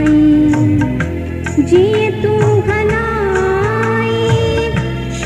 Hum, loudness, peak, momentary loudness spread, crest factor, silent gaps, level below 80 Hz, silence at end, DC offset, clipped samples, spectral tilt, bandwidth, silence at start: none; -13 LUFS; 0 dBFS; 7 LU; 12 dB; none; -30 dBFS; 0 s; under 0.1%; under 0.1%; -7 dB/octave; 11.5 kHz; 0 s